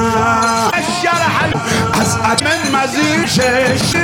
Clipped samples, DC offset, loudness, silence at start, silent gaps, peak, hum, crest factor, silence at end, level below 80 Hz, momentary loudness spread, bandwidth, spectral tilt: under 0.1%; under 0.1%; -13 LUFS; 0 s; none; 0 dBFS; none; 14 dB; 0 s; -40 dBFS; 2 LU; 17 kHz; -3.5 dB/octave